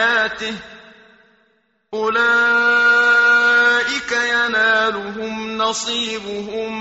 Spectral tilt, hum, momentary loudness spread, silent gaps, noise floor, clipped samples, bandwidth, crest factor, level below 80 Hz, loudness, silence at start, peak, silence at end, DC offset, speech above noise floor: 1 dB/octave; none; 14 LU; none; -62 dBFS; under 0.1%; 8 kHz; 12 dB; -56 dBFS; -16 LUFS; 0 s; -6 dBFS; 0 s; under 0.1%; 44 dB